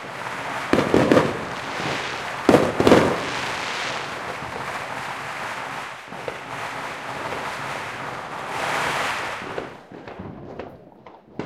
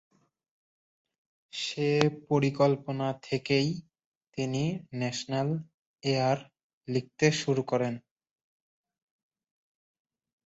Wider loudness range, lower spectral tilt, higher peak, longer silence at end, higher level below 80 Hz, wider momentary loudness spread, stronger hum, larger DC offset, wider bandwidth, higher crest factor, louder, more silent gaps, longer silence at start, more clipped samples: first, 10 LU vs 3 LU; about the same, -5 dB/octave vs -5.5 dB/octave; first, 0 dBFS vs -4 dBFS; second, 0 s vs 2.45 s; first, -54 dBFS vs -68 dBFS; first, 19 LU vs 10 LU; neither; neither; first, 16.5 kHz vs 8 kHz; about the same, 24 dB vs 26 dB; first, -24 LUFS vs -29 LUFS; second, none vs 4.06-4.21 s, 5.74-5.94 s, 6.63-6.81 s; second, 0 s vs 1.55 s; neither